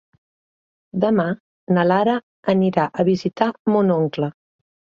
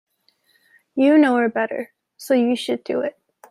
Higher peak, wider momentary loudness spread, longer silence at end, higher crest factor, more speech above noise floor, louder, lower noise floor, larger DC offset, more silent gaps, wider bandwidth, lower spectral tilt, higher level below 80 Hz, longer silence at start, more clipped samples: about the same, -2 dBFS vs -4 dBFS; second, 9 LU vs 16 LU; first, 0.65 s vs 0.4 s; about the same, 18 dB vs 16 dB; first, over 72 dB vs 45 dB; about the same, -20 LUFS vs -20 LUFS; first, under -90 dBFS vs -63 dBFS; neither; first, 1.40-1.67 s, 2.23-2.43 s, 3.59-3.65 s vs none; second, 7 kHz vs 15 kHz; first, -8.5 dB/octave vs -4.5 dB/octave; first, -62 dBFS vs -72 dBFS; about the same, 0.95 s vs 0.95 s; neither